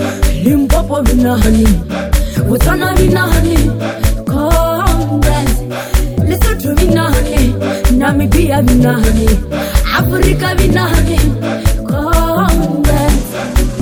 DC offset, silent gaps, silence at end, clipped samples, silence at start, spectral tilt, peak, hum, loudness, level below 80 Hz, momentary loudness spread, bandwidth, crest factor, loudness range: under 0.1%; none; 0 s; under 0.1%; 0 s; -6 dB/octave; 0 dBFS; none; -12 LUFS; -14 dBFS; 5 LU; over 20 kHz; 10 dB; 2 LU